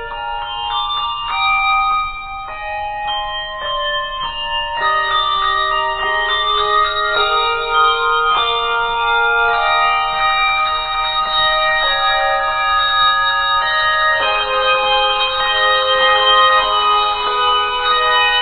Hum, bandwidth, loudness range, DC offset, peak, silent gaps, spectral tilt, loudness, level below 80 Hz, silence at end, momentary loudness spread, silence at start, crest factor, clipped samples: none; 4.7 kHz; 5 LU; under 0.1%; 0 dBFS; none; -4.5 dB/octave; -15 LUFS; -38 dBFS; 0 s; 8 LU; 0 s; 16 dB; under 0.1%